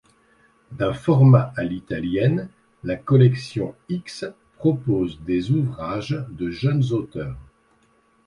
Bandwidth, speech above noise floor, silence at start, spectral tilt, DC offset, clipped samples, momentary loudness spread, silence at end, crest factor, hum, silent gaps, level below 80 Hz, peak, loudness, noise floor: 10.5 kHz; 40 dB; 0.7 s; -8.5 dB/octave; under 0.1%; under 0.1%; 16 LU; 0.85 s; 20 dB; none; none; -50 dBFS; -2 dBFS; -22 LUFS; -61 dBFS